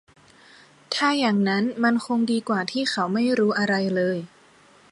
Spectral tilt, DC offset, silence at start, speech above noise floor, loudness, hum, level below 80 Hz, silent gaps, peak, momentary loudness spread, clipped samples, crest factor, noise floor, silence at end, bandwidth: -5 dB/octave; under 0.1%; 0.9 s; 32 dB; -23 LUFS; none; -70 dBFS; none; -8 dBFS; 5 LU; under 0.1%; 16 dB; -54 dBFS; 0.65 s; 11.5 kHz